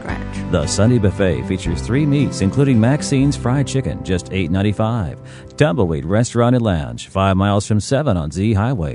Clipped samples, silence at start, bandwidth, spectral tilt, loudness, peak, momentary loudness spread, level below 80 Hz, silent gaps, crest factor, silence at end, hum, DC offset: under 0.1%; 0 s; 10.5 kHz; -6.5 dB/octave; -17 LUFS; 0 dBFS; 7 LU; -34 dBFS; none; 16 dB; 0 s; none; under 0.1%